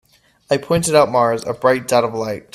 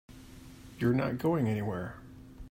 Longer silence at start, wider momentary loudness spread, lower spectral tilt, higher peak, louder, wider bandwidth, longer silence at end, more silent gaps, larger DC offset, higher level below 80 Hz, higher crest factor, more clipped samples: first, 0.5 s vs 0.1 s; second, 8 LU vs 22 LU; second, -4.5 dB/octave vs -8 dB/octave; first, 0 dBFS vs -16 dBFS; first, -17 LUFS vs -31 LUFS; about the same, 15 kHz vs 16 kHz; first, 0.15 s vs 0 s; neither; neither; first, -50 dBFS vs -56 dBFS; about the same, 18 dB vs 16 dB; neither